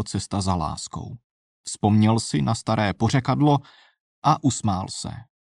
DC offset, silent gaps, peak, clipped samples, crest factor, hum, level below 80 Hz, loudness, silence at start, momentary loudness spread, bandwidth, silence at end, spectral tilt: under 0.1%; 1.24-1.64 s, 4.00-4.22 s; -6 dBFS; under 0.1%; 16 dB; none; -48 dBFS; -23 LUFS; 0 s; 15 LU; 11 kHz; 0.3 s; -5.5 dB/octave